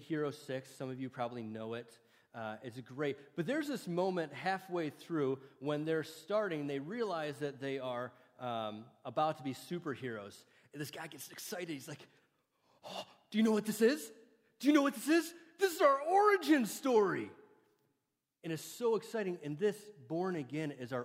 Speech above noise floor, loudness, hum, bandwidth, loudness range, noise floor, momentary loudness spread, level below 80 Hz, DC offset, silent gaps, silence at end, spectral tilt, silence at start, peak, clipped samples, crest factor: 50 dB; -36 LUFS; none; 16 kHz; 11 LU; -86 dBFS; 16 LU; -88 dBFS; under 0.1%; none; 0 s; -5 dB/octave; 0 s; -16 dBFS; under 0.1%; 20 dB